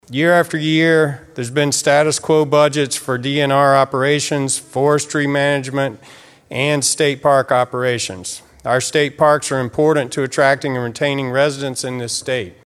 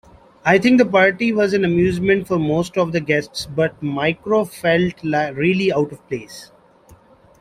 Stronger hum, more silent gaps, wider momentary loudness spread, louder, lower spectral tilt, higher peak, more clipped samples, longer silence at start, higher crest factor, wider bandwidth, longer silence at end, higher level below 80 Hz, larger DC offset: neither; neither; about the same, 9 LU vs 10 LU; about the same, -16 LUFS vs -18 LUFS; second, -4 dB/octave vs -6 dB/octave; about the same, 0 dBFS vs -2 dBFS; neither; second, 0.1 s vs 0.45 s; about the same, 16 dB vs 16 dB; about the same, 14.5 kHz vs 15 kHz; second, 0.15 s vs 0.45 s; second, -58 dBFS vs -50 dBFS; neither